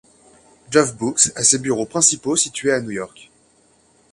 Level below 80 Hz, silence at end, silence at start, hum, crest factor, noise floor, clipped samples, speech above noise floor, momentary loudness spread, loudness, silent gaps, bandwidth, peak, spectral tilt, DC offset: -58 dBFS; 1.05 s; 0.7 s; none; 20 dB; -57 dBFS; under 0.1%; 38 dB; 11 LU; -17 LUFS; none; 11.5 kHz; 0 dBFS; -2.5 dB/octave; under 0.1%